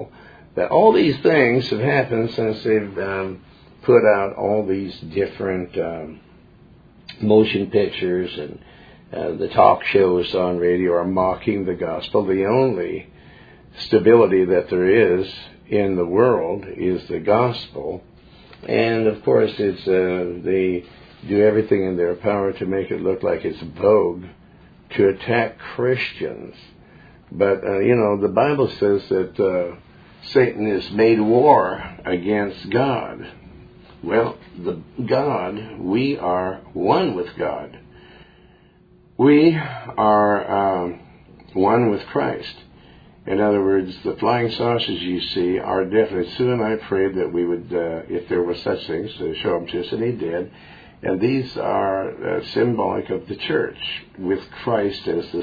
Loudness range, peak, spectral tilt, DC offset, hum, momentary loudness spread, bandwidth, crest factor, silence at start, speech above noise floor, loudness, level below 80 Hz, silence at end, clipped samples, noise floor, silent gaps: 5 LU; 0 dBFS; -8.5 dB/octave; under 0.1%; none; 13 LU; 5 kHz; 20 dB; 0 s; 33 dB; -20 LUFS; -52 dBFS; 0 s; under 0.1%; -52 dBFS; none